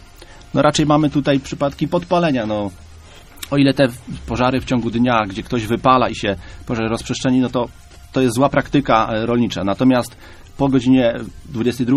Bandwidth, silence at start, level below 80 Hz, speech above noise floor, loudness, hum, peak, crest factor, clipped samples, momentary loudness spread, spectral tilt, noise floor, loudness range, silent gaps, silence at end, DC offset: 14 kHz; 0.2 s; -40 dBFS; 23 dB; -18 LUFS; none; 0 dBFS; 18 dB; under 0.1%; 10 LU; -6 dB/octave; -40 dBFS; 2 LU; none; 0 s; under 0.1%